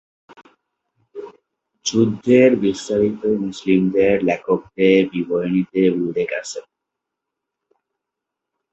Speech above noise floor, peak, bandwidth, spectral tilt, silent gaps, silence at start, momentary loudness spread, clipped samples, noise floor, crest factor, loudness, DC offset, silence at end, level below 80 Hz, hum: 65 dB; -2 dBFS; 8.2 kHz; -6 dB/octave; none; 1.15 s; 15 LU; under 0.1%; -82 dBFS; 18 dB; -18 LUFS; under 0.1%; 2.1 s; -56 dBFS; none